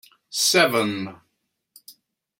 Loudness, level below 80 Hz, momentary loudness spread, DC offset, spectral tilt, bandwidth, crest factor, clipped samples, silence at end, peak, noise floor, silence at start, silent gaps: -20 LUFS; -72 dBFS; 15 LU; under 0.1%; -2 dB/octave; 16.5 kHz; 22 dB; under 0.1%; 0.5 s; -2 dBFS; -75 dBFS; 0.3 s; none